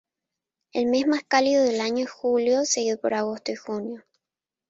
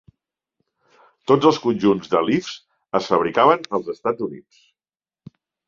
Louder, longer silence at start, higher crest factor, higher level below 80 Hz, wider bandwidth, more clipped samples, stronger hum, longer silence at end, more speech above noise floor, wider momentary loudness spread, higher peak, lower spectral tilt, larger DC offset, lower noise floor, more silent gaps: second, -24 LUFS vs -20 LUFS; second, 0.75 s vs 1.3 s; about the same, 18 dB vs 20 dB; second, -70 dBFS vs -62 dBFS; first, 8.2 kHz vs 7.4 kHz; neither; neither; second, 0.7 s vs 1.25 s; second, 66 dB vs over 71 dB; second, 11 LU vs 14 LU; second, -6 dBFS vs -2 dBFS; second, -2.5 dB/octave vs -6 dB/octave; neither; about the same, -89 dBFS vs under -90 dBFS; neither